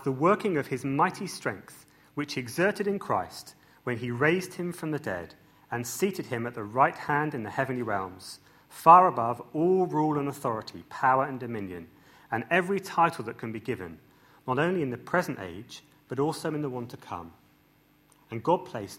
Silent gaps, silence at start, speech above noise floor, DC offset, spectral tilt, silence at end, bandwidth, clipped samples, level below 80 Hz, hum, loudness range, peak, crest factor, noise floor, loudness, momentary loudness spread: none; 0 s; 35 dB; under 0.1%; -6 dB/octave; 0 s; 16 kHz; under 0.1%; -68 dBFS; none; 8 LU; -4 dBFS; 24 dB; -63 dBFS; -28 LUFS; 16 LU